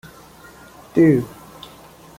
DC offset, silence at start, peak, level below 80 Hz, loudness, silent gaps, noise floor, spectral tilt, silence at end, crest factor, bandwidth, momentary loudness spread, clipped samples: under 0.1%; 0.95 s; -4 dBFS; -54 dBFS; -17 LUFS; none; -44 dBFS; -8 dB/octave; 0.9 s; 18 dB; 16 kHz; 25 LU; under 0.1%